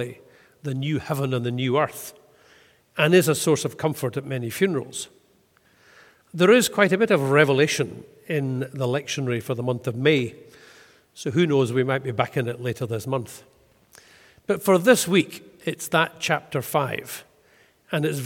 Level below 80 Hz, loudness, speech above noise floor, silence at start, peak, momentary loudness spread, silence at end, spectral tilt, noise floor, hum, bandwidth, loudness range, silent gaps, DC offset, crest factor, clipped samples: -66 dBFS; -23 LUFS; 38 dB; 0 s; -2 dBFS; 16 LU; 0 s; -5 dB/octave; -61 dBFS; none; 17.5 kHz; 5 LU; none; under 0.1%; 22 dB; under 0.1%